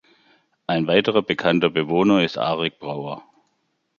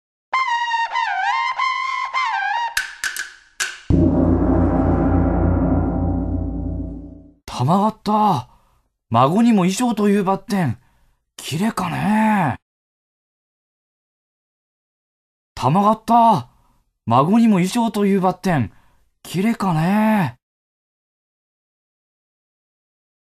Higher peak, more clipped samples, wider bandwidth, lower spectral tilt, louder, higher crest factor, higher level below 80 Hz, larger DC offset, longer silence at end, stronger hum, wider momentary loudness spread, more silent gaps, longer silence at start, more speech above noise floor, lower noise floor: about the same, -2 dBFS vs 0 dBFS; neither; second, 7.2 kHz vs 14 kHz; about the same, -6.5 dB/octave vs -6 dB/octave; about the same, -20 LUFS vs -19 LUFS; about the same, 20 dB vs 20 dB; second, -60 dBFS vs -34 dBFS; neither; second, 0.8 s vs 3.05 s; neither; about the same, 13 LU vs 11 LU; second, none vs 12.62-15.55 s; first, 0.7 s vs 0.3 s; first, 51 dB vs 45 dB; first, -71 dBFS vs -61 dBFS